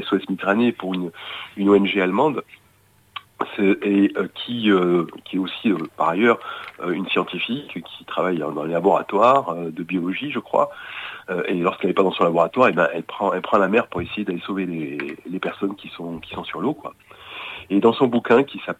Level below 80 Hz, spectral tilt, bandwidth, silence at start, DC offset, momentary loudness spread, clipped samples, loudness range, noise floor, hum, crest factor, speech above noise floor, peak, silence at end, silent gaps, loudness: -62 dBFS; -7 dB/octave; 13.5 kHz; 0 s; under 0.1%; 15 LU; under 0.1%; 4 LU; -57 dBFS; none; 18 dB; 36 dB; -4 dBFS; 0.05 s; none; -21 LUFS